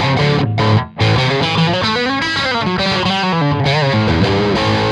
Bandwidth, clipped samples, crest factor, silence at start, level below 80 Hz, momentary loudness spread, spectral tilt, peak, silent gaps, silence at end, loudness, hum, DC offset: 10 kHz; under 0.1%; 14 dB; 0 s; -36 dBFS; 2 LU; -6 dB/octave; -2 dBFS; none; 0 s; -14 LUFS; none; under 0.1%